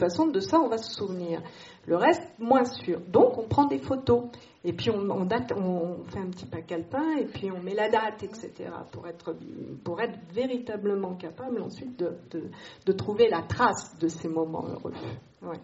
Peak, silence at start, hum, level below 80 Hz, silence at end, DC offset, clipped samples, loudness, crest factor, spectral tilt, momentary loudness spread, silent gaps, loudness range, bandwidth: -8 dBFS; 0 s; none; -60 dBFS; 0 s; under 0.1%; under 0.1%; -28 LUFS; 20 dB; -5 dB/octave; 15 LU; none; 8 LU; 8 kHz